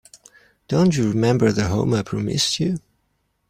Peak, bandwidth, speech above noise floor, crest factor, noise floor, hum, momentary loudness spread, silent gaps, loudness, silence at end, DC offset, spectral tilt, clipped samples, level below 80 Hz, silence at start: -4 dBFS; 16 kHz; 50 dB; 16 dB; -69 dBFS; none; 7 LU; none; -20 LUFS; 0.7 s; under 0.1%; -5.5 dB/octave; under 0.1%; -50 dBFS; 0.7 s